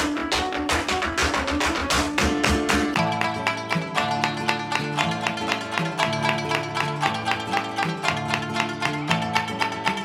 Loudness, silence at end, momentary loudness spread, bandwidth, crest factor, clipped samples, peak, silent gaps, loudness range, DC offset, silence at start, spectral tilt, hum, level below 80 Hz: -23 LUFS; 0 s; 4 LU; 17 kHz; 20 dB; under 0.1%; -6 dBFS; none; 2 LU; under 0.1%; 0 s; -4 dB/octave; none; -40 dBFS